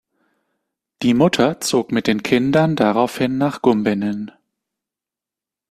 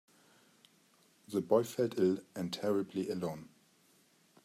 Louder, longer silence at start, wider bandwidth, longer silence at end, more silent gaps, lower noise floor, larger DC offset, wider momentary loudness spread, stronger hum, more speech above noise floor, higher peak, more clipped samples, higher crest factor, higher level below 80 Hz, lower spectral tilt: first, -18 LUFS vs -35 LUFS; second, 1 s vs 1.3 s; second, 14.5 kHz vs 16 kHz; first, 1.4 s vs 1 s; neither; first, -88 dBFS vs -68 dBFS; neither; about the same, 7 LU vs 9 LU; neither; first, 71 dB vs 35 dB; first, -2 dBFS vs -16 dBFS; neither; about the same, 18 dB vs 22 dB; first, -56 dBFS vs -80 dBFS; about the same, -5.5 dB/octave vs -6 dB/octave